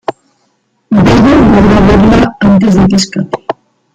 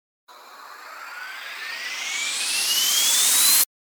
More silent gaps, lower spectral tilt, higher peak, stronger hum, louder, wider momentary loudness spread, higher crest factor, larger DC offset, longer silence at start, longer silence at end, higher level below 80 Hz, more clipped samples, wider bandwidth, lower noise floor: neither; first, -6.5 dB/octave vs 4 dB/octave; first, 0 dBFS vs -6 dBFS; neither; first, -7 LUFS vs -18 LUFS; second, 14 LU vs 22 LU; second, 8 dB vs 18 dB; neither; second, 0.1 s vs 0.3 s; first, 0.4 s vs 0.25 s; first, -22 dBFS vs under -90 dBFS; neither; second, 9.2 kHz vs over 20 kHz; first, -57 dBFS vs -43 dBFS